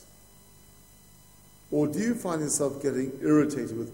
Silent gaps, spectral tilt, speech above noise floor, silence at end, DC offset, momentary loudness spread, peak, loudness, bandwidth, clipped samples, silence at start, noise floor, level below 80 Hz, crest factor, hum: none; -5.5 dB/octave; 28 dB; 0 s; under 0.1%; 6 LU; -12 dBFS; -27 LUFS; 16 kHz; under 0.1%; 1.7 s; -55 dBFS; -62 dBFS; 18 dB; 50 Hz at -55 dBFS